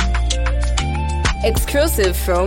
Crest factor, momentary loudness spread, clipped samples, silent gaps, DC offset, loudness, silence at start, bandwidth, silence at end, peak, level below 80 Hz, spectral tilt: 14 dB; 3 LU; under 0.1%; none; under 0.1%; -18 LUFS; 0 s; 17 kHz; 0 s; -4 dBFS; -20 dBFS; -4.5 dB/octave